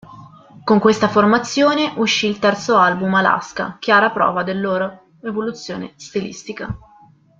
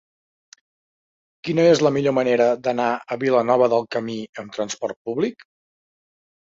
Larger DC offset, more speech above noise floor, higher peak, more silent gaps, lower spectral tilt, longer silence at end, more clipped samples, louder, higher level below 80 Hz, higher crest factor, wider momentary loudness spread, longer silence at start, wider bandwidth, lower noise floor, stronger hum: neither; second, 32 dB vs over 70 dB; about the same, -2 dBFS vs -4 dBFS; second, none vs 4.29-4.33 s, 4.96-5.05 s; about the same, -4.5 dB/octave vs -5.5 dB/octave; second, 0.65 s vs 1.15 s; neither; first, -17 LUFS vs -20 LUFS; first, -52 dBFS vs -66 dBFS; about the same, 16 dB vs 18 dB; first, 15 LU vs 12 LU; second, 0.1 s vs 1.45 s; about the same, 7.6 kHz vs 7.8 kHz; second, -49 dBFS vs under -90 dBFS; neither